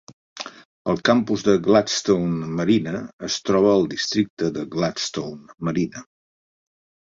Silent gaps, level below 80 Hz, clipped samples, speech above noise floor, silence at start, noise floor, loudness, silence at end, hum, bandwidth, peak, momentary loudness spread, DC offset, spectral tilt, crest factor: 0.65-0.85 s, 3.13-3.19 s, 4.30-4.37 s; -56 dBFS; under 0.1%; over 69 dB; 0.35 s; under -90 dBFS; -21 LUFS; 1 s; none; 7.8 kHz; -2 dBFS; 14 LU; under 0.1%; -5 dB/octave; 20 dB